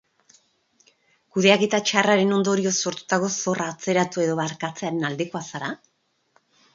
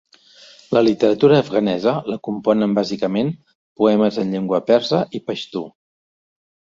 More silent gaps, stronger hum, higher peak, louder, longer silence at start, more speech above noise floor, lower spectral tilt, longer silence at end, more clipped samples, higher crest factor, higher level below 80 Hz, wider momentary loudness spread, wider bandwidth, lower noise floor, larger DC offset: second, none vs 3.55-3.76 s; neither; about the same, 0 dBFS vs -2 dBFS; second, -22 LUFS vs -18 LUFS; first, 1.35 s vs 0.7 s; first, 43 dB vs 30 dB; second, -4 dB/octave vs -7 dB/octave; about the same, 1 s vs 1.05 s; neither; first, 24 dB vs 18 dB; second, -70 dBFS vs -60 dBFS; about the same, 12 LU vs 11 LU; about the same, 7.8 kHz vs 7.6 kHz; first, -65 dBFS vs -47 dBFS; neither